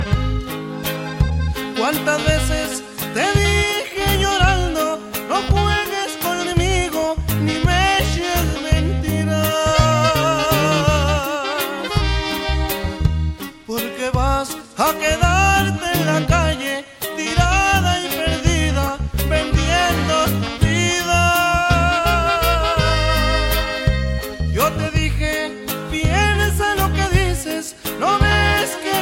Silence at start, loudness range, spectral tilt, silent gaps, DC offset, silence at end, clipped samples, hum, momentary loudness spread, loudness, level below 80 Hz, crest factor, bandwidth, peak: 0 s; 3 LU; -4.5 dB/octave; none; under 0.1%; 0 s; under 0.1%; none; 8 LU; -18 LUFS; -24 dBFS; 16 dB; 16.5 kHz; -2 dBFS